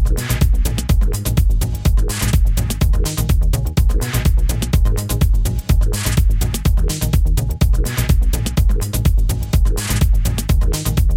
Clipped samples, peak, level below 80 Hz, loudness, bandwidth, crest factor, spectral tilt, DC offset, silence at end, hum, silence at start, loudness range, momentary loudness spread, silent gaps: under 0.1%; -2 dBFS; -16 dBFS; -18 LUFS; 17 kHz; 12 dB; -5 dB/octave; under 0.1%; 0 s; none; 0 s; 0 LU; 2 LU; none